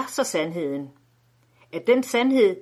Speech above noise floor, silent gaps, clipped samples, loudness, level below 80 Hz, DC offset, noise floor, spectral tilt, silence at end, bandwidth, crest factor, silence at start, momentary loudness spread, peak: 39 dB; none; under 0.1%; -23 LUFS; -74 dBFS; under 0.1%; -62 dBFS; -4 dB/octave; 0 s; 14.5 kHz; 16 dB; 0 s; 15 LU; -8 dBFS